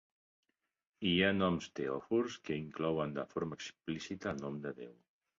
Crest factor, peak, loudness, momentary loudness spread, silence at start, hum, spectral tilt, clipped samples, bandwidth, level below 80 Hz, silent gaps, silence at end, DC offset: 22 dB; -16 dBFS; -37 LUFS; 13 LU; 1 s; none; -4 dB/octave; under 0.1%; 7.4 kHz; -64 dBFS; none; 0.45 s; under 0.1%